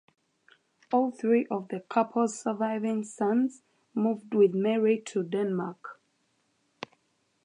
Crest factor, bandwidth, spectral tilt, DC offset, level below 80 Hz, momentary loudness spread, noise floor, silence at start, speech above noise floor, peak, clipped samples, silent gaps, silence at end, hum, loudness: 18 dB; 10.5 kHz; -6.5 dB/octave; under 0.1%; -82 dBFS; 17 LU; -73 dBFS; 0.9 s; 46 dB; -12 dBFS; under 0.1%; none; 1.5 s; none; -28 LUFS